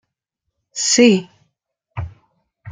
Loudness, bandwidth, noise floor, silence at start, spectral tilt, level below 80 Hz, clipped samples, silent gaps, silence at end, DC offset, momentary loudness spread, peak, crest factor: -14 LUFS; 9.8 kHz; -78 dBFS; 0.75 s; -3.5 dB/octave; -50 dBFS; under 0.1%; none; 0 s; under 0.1%; 22 LU; -2 dBFS; 18 dB